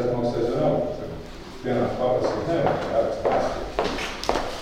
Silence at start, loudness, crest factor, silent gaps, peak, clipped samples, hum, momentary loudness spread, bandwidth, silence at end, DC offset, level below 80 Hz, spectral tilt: 0 s; -25 LUFS; 22 dB; none; -4 dBFS; under 0.1%; none; 10 LU; 16 kHz; 0 s; under 0.1%; -40 dBFS; -6 dB/octave